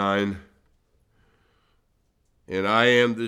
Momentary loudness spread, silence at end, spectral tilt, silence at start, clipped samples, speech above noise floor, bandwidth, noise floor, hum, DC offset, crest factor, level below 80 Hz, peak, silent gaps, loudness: 14 LU; 0 s; -5 dB/octave; 0 s; under 0.1%; 46 dB; 12.5 kHz; -68 dBFS; none; under 0.1%; 22 dB; -62 dBFS; -4 dBFS; none; -22 LUFS